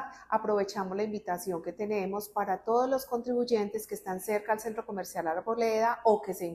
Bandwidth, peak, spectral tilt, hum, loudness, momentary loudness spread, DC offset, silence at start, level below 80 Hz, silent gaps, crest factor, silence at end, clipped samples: 14.5 kHz; -12 dBFS; -5 dB/octave; none; -31 LUFS; 9 LU; under 0.1%; 0 s; -68 dBFS; none; 18 dB; 0 s; under 0.1%